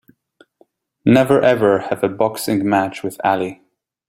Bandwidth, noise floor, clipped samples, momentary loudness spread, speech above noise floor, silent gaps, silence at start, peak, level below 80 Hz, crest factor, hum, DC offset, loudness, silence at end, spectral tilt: 16 kHz; -58 dBFS; under 0.1%; 9 LU; 42 dB; none; 1.05 s; -2 dBFS; -56 dBFS; 16 dB; none; under 0.1%; -17 LUFS; 0.55 s; -6 dB/octave